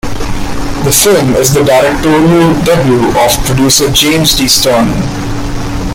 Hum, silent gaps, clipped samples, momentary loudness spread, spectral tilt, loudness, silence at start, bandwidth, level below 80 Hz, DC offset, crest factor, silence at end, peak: none; none; 0.2%; 11 LU; -4 dB/octave; -8 LUFS; 0.05 s; over 20 kHz; -22 dBFS; under 0.1%; 8 dB; 0 s; 0 dBFS